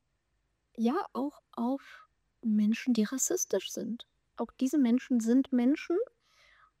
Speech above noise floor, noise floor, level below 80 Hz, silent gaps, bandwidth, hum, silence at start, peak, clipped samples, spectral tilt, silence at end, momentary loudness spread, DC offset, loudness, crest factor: 48 dB; -78 dBFS; -74 dBFS; none; 16 kHz; none; 0.8 s; -16 dBFS; under 0.1%; -4.5 dB/octave; 0.75 s; 13 LU; under 0.1%; -31 LUFS; 14 dB